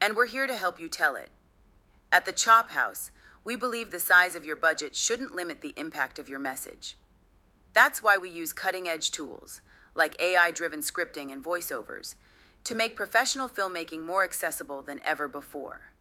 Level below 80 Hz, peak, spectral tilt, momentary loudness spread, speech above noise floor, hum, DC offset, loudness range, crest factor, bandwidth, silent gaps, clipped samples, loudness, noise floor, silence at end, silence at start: -66 dBFS; -4 dBFS; -0.5 dB/octave; 19 LU; 34 dB; none; under 0.1%; 5 LU; 24 dB; 17.5 kHz; none; under 0.1%; -27 LUFS; -62 dBFS; 0.15 s; 0 s